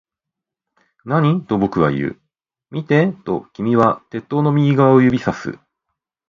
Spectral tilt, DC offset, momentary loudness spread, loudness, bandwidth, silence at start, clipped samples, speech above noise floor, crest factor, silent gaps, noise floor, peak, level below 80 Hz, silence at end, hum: -9 dB/octave; under 0.1%; 14 LU; -17 LUFS; 7.2 kHz; 1.05 s; under 0.1%; 68 dB; 18 dB; none; -84 dBFS; 0 dBFS; -52 dBFS; 0.75 s; none